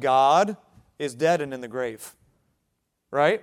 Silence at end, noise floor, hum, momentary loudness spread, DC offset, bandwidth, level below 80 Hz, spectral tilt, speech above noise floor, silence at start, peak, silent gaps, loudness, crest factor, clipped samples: 0 s; -76 dBFS; none; 21 LU; under 0.1%; 16 kHz; -70 dBFS; -4.5 dB/octave; 53 dB; 0 s; -6 dBFS; none; -24 LUFS; 18 dB; under 0.1%